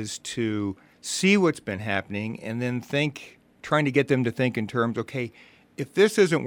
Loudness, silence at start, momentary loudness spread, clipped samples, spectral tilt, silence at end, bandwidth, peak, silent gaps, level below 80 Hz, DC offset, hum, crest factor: -25 LUFS; 0 s; 14 LU; under 0.1%; -5 dB/octave; 0 s; 17.5 kHz; -6 dBFS; none; -66 dBFS; under 0.1%; none; 20 dB